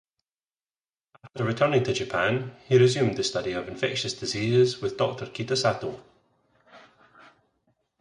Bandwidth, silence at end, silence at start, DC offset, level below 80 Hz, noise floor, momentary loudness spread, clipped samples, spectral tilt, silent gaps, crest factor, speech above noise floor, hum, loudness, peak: 11 kHz; 1.2 s; 1.25 s; under 0.1%; -60 dBFS; under -90 dBFS; 11 LU; under 0.1%; -5 dB/octave; none; 20 dB; over 65 dB; none; -25 LUFS; -8 dBFS